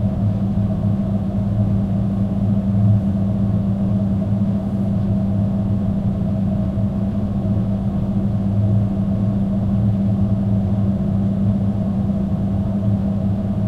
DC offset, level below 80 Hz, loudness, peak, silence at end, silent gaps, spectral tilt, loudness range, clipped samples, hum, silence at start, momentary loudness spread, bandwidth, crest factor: under 0.1%; -32 dBFS; -19 LUFS; -6 dBFS; 0 s; none; -11 dB/octave; 1 LU; under 0.1%; none; 0 s; 3 LU; 4.3 kHz; 12 dB